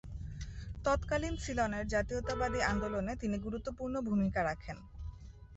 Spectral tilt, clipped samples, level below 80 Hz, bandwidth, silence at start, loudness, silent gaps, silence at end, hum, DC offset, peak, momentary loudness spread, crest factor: -5.5 dB/octave; under 0.1%; -46 dBFS; 8 kHz; 0.05 s; -36 LUFS; none; 0 s; none; under 0.1%; -18 dBFS; 14 LU; 18 dB